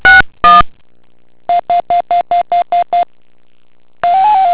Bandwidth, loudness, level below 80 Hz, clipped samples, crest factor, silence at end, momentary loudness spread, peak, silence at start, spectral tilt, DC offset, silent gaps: 4 kHz; -11 LUFS; -34 dBFS; 1%; 12 dB; 0 s; 11 LU; 0 dBFS; 0.05 s; -6.5 dB/octave; under 0.1%; none